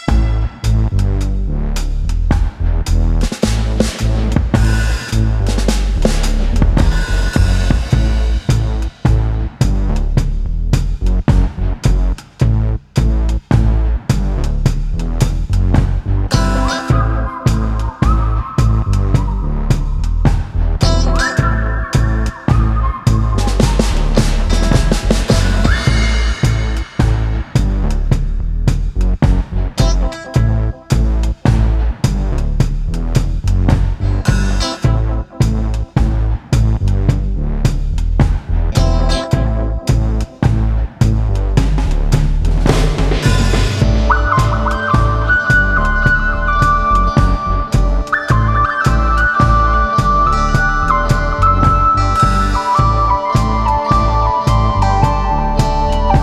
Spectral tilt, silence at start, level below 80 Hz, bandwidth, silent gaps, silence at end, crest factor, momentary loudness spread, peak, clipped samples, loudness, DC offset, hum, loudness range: -6 dB/octave; 0 s; -16 dBFS; 12.5 kHz; none; 0 s; 12 dB; 6 LU; 0 dBFS; under 0.1%; -15 LUFS; under 0.1%; none; 4 LU